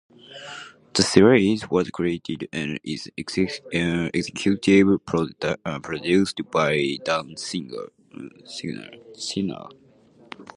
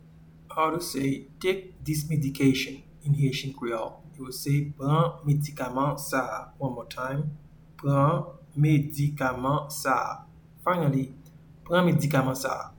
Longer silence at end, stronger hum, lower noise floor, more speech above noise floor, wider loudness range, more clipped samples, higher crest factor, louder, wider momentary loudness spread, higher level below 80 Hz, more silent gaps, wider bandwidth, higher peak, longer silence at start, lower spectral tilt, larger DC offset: about the same, 0.15 s vs 0.05 s; neither; about the same, -54 dBFS vs -51 dBFS; first, 31 dB vs 25 dB; first, 7 LU vs 2 LU; neither; first, 24 dB vs 18 dB; first, -23 LUFS vs -27 LUFS; first, 22 LU vs 11 LU; about the same, -54 dBFS vs -54 dBFS; neither; second, 11.5 kHz vs 19 kHz; first, 0 dBFS vs -10 dBFS; about the same, 0.3 s vs 0.25 s; about the same, -5 dB/octave vs -6 dB/octave; neither